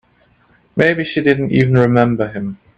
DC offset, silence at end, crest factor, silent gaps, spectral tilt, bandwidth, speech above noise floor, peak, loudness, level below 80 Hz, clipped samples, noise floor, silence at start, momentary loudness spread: under 0.1%; 0.25 s; 16 dB; none; -8.5 dB/octave; 6.4 kHz; 40 dB; 0 dBFS; -15 LUFS; -48 dBFS; under 0.1%; -54 dBFS; 0.75 s; 10 LU